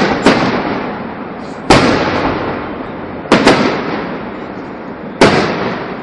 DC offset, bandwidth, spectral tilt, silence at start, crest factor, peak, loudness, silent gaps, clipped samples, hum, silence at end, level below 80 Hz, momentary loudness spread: under 0.1%; 12 kHz; -5 dB/octave; 0 s; 14 dB; 0 dBFS; -13 LUFS; none; 0.3%; none; 0 s; -36 dBFS; 16 LU